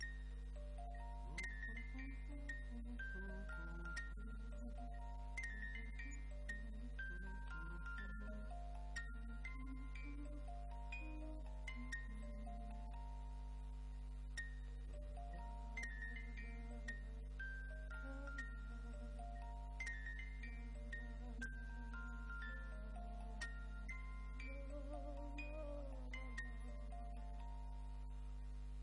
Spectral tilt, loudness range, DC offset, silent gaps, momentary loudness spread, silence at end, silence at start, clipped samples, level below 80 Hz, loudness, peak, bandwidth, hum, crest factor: -5.5 dB/octave; 1 LU; under 0.1%; none; 4 LU; 0 s; 0 s; under 0.1%; -50 dBFS; -52 LUFS; -36 dBFS; 10.5 kHz; 50 Hz at -50 dBFS; 14 dB